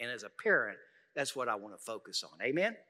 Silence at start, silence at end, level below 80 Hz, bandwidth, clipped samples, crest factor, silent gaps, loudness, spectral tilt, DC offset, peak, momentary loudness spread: 0 s; 0.1 s; under -90 dBFS; 15.5 kHz; under 0.1%; 22 dB; none; -35 LUFS; -3 dB/octave; under 0.1%; -16 dBFS; 14 LU